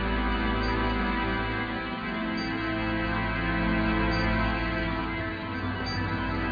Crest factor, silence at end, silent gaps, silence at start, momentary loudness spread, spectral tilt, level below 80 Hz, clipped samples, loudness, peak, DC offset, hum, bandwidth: 14 dB; 0 s; none; 0 s; 5 LU; -7 dB/octave; -36 dBFS; under 0.1%; -28 LUFS; -14 dBFS; under 0.1%; none; 5 kHz